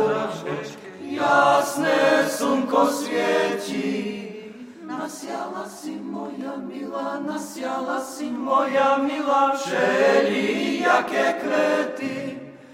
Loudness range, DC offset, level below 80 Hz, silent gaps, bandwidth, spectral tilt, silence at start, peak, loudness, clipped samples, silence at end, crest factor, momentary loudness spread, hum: 10 LU; under 0.1%; -70 dBFS; none; 16 kHz; -4 dB/octave; 0 s; -4 dBFS; -22 LUFS; under 0.1%; 0 s; 20 dB; 14 LU; none